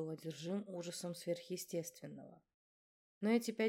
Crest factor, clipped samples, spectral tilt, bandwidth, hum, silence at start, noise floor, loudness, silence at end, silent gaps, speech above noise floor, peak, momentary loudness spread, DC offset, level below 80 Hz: 20 dB; under 0.1%; -5 dB/octave; 17.5 kHz; none; 0 s; under -90 dBFS; -42 LUFS; 0 s; 2.54-3.21 s; over 49 dB; -22 dBFS; 17 LU; under 0.1%; -90 dBFS